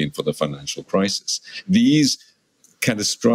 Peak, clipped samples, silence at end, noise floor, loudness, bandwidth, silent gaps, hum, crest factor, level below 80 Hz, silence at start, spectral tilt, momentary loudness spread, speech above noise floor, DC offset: -4 dBFS; under 0.1%; 0 s; -59 dBFS; -21 LUFS; 16 kHz; none; none; 18 dB; -58 dBFS; 0 s; -4 dB/octave; 10 LU; 39 dB; under 0.1%